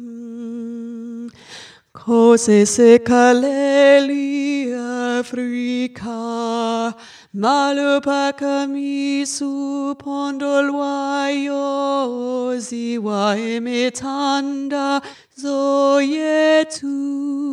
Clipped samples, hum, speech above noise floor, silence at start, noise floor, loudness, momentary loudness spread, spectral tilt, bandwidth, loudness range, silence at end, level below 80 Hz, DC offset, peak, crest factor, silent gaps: under 0.1%; none; 23 dB; 0 s; -40 dBFS; -18 LUFS; 17 LU; -4 dB/octave; 11.5 kHz; 7 LU; 0 s; -64 dBFS; under 0.1%; 0 dBFS; 18 dB; none